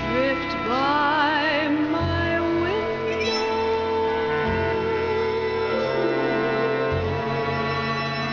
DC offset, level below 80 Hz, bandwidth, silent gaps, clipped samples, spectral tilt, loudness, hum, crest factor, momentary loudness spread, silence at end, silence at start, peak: under 0.1%; -42 dBFS; 7.2 kHz; none; under 0.1%; -6 dB/octave; -23 LUFS; none; 14 dB; 5 LU; 0 s; 0 s; -10 dBFS